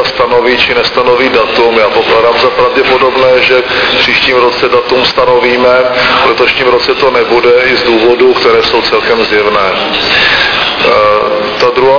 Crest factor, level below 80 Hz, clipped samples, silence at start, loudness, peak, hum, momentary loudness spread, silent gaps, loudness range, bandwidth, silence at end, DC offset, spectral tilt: 8 dB; -36 dBFS; 2%; 0 s; -7 LUFS; 0 dBFS; none; 3 LU; none; 1 LU; 5.4 kHz; 0 s; 0.4%; -4.5 dB/octave